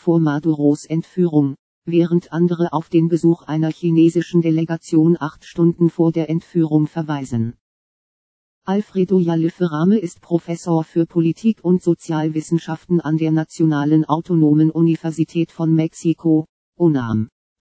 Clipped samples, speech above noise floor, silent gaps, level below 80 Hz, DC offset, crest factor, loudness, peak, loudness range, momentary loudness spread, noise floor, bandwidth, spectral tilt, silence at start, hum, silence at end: under 0.1%; over 73 dB; 1.59-1.82 s, 7.61-8.62 s, 16.49-16.73 s; -60 dBFS; under 0.1%; 16 dB; -18 LUFS; -2 dBFS; 3 LU; 7 LU; under -90 dBFS; 8 kHz; -8.5 dB/octave; 0.05 s; none; 0.35 s